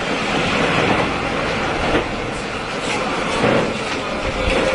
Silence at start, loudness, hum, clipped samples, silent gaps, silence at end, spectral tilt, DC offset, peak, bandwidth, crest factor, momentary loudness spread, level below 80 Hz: 0 s; -19 LUFS; none; under 0.1%; none; 0 s; -4.5 dB/octave; under 0.1%; -4 dBFS; 11 kHz; 16 dB; 7 LU; -34 dBFS